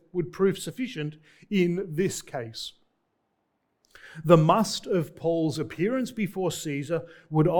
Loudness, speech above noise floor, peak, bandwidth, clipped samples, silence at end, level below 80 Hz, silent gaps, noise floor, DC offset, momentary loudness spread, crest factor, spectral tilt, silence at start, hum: -27 LUFS; 49 dB; -2 dBFS; 19 kHz; under 0.1%; 0 s; -60 dBFS; none; -75 dBFS; under 0.1%; 15 LU; 24 dB; -6 dB/octave; 0.15 s; none